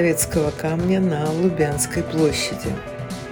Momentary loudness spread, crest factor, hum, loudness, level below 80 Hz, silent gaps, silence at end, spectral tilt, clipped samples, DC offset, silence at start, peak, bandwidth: 9 LU; 16 dB; none; -21 LUFS; -42 dBFS; none; 0 s; -5 dB/octave; under 0.1%; under 0.1%; 0 s; -6 dBFS; 18 kHz